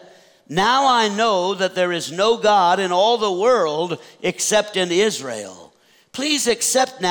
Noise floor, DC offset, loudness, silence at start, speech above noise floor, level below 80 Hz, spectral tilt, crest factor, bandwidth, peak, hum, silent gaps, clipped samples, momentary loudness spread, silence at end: -53 dBFS; under 0.1%; -18 LUFS; 0.5 s; 34 dB; -62 dBFS; -2.5 dB/octave; 12 dB; over 20 kHz; -6 dBFS; none; none; under 0.1%; 10 LU; 0 s